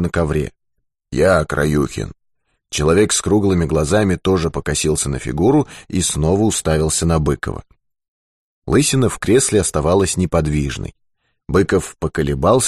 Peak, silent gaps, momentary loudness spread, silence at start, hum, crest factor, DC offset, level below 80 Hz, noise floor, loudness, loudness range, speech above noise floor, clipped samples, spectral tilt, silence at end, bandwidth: -2 dBFS; 8.08-8.62 s; 9 LU; 0 s; none; 14 dB; 0.2%; -32 dBFS; -72 dBFS; -17 LUFS; 2 LU; 56 dB; under 0.1%; -5 dB/octave; 0 s; 13 kHz